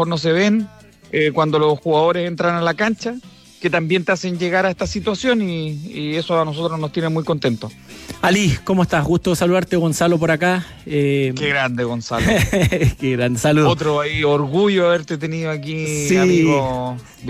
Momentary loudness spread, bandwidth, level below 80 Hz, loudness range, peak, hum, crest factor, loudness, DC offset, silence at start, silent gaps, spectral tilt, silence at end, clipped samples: 8 LU; 15.5 kHz; -40 dBFS; 3 LU; -4 dBFS; none; 14 dB; -18 LUFS; under 0.1%; 0 s; none; -5.5 dB/octave; 0 s; under 0.1%